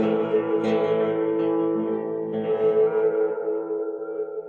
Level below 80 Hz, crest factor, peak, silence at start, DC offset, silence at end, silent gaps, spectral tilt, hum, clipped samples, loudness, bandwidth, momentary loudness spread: -72 dBFS; 12 dB; -12 dBFS; 0 s; under 0.1%; 0 s; none; -8.5 dB/octave; none; under 0.1%; -24 LUFS; 4.4 kHz; 8 LU